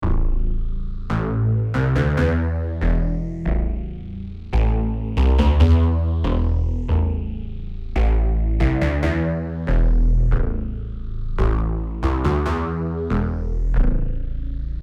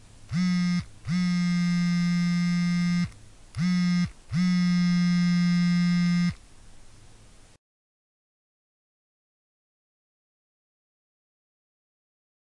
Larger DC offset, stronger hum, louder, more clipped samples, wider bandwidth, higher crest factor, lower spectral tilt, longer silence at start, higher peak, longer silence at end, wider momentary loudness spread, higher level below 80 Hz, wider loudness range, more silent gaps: neither; neither; first, -22 LUFS vs -25 LUFS; neither; second, 6.6 kHz vs 11 kHz; about the same, 12 dB vs 10 dB; first, -8.5 dB/octave vs -6 dB/octave; second, 0 s vs 0.3 s; first, -6 dBFS vs -16 dBFS; second, 0 s vs 5.55 s; first, 11 LU vs 7 LU; first, -20 dBFS vs -54 dBFS; about the same, 3 LU vs 5 LU; neither